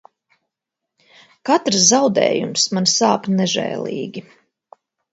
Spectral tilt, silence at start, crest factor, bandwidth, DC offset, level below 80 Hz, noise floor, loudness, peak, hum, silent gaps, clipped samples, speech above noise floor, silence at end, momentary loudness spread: -3 dB/octave; 1.45 s; 20 dB; 8.2 kHz; under 0.1%; -66 dBFS; -82 dBFS; -16 LUFS; 0 dBFS; none; none; under 0.1%; 64 dB; 0.9 s; 15 LU